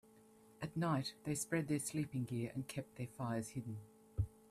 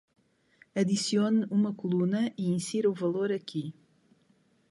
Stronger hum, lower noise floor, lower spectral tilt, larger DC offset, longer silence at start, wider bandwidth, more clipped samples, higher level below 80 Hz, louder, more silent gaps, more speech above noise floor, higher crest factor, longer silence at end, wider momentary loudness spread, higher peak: neither; about the same, -65 dBFS vs -67 dBFS; about the same, -5.5 dB/octave vs -6 dB/octave; neither; second, 0.15 s vs 0.75 s; first, 15 kHz vs 11.5 kHz; neither; first, -62 dBFS vs -74 dBFS; second, -42 LUFS vs -29 LUFS; neither; second, 24 dB vs 39 dB; first, 20 dB vs 14 dB; second, 0.2 s vs 1 s; about the same, 11 LU vs 10 LU; second, -24 dBFS vs -16 dBFS